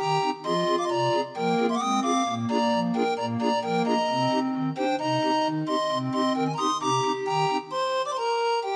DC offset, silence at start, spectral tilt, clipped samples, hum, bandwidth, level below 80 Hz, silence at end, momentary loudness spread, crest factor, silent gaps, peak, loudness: under 0.1%; 0 s; -5 dB/octave; under 0.1%; none; 11 kHz; -76 dBFS; 0 s; 3 LU; 14 dB; none; -12 dBFS; -25 LUFS